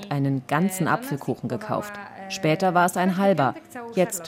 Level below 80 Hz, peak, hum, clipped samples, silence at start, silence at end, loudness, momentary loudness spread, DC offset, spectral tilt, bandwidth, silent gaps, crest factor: -68 dBFS; -6 dBFS; none; under 0.1%; 0 s; 0 s; -24 LUFS; 10 LU; under 0.1%; -5.5 dB/octave; 16.5 kHz; none; 16 dB